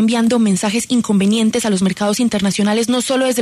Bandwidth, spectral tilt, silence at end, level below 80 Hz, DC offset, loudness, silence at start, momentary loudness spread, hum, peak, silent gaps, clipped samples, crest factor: 13.5 kHz; -4.5 dB/octave; 0 s; -52 dBFS; under 0.1%; -15 LUFS; 0 s; 3 LU; none; -6 dBFS; none; under 0.1%; 10 dB